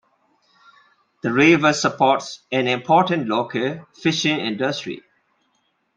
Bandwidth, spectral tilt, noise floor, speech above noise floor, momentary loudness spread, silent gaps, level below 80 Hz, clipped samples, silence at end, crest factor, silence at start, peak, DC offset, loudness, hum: 9.2 kHz; -4.5 dB/octave; -68 dBFS; 48 dB; 12 LU; none; -64 dBFS; under 0.1%; 0.95 s; 20 dB; 1.25 s; -2 dBFS; under 0.1%; -19 LUFS; none